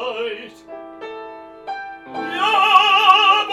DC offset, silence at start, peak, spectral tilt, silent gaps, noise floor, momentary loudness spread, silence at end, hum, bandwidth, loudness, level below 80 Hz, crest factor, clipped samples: under 0.1%; 0 s; 0 dBFS; -1 dB/octave; none; -37 dBFS; 25 LU; 0 s; none; 13 kHz; -14 LUFS; -66 dBFS; 18 dB; under 0.1%